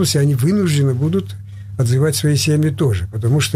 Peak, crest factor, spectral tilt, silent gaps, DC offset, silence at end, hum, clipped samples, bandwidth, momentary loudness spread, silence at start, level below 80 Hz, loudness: -6 dBFS; 10 dB; -5.5 dB/octave; none; under 0.1%; 0 s; none; under 0.1%; 16 kHz; 7 LU; 0 s; -42 dBFS; -16 LUFS